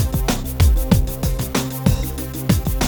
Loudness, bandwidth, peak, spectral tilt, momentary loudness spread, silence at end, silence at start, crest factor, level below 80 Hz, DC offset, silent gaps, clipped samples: -20 LUFS; over 20 kHz; -2 dBFS; -5.5 dB/octave; 6 LU; 0 s; 0 s; 16 dB; -22 dBFS; under 0.1%; none; under 0.1%